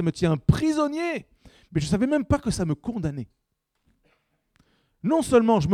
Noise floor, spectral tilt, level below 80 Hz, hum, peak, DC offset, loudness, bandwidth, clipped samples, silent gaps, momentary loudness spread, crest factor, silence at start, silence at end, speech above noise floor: -71 dBFS; -6.5 dB/octave; -44 dBFS; none; -6 dBFS; under 0.1%; -24 LUFS; 14.5 kHz; under 0.1%; none; 12 LU; 20 dB; 0 s; 0 s; 49 dB